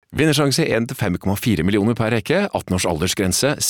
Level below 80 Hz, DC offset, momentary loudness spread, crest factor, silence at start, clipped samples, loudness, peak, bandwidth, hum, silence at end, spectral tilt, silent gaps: -46 dBFS; under 0.1%; 5 LU; 14 dB; 0.1 s; under 0.1%; -19 LUFS; -6 dBFS; 19.5 kHz; none; 0 s; -4.5 dB/octave; none